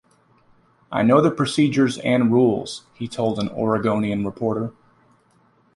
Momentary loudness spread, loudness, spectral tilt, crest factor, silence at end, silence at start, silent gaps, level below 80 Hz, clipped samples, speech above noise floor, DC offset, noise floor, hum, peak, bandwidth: 12 LU; -20 LUFS; -6.5 dB/octave; 18 dB; 1.05 s; 0.9 s; none; -56 dBFS; under 0.1%; 40 dB; under 0.1%; -59 dBFS; none; -4 dBFS; 11.5 kHz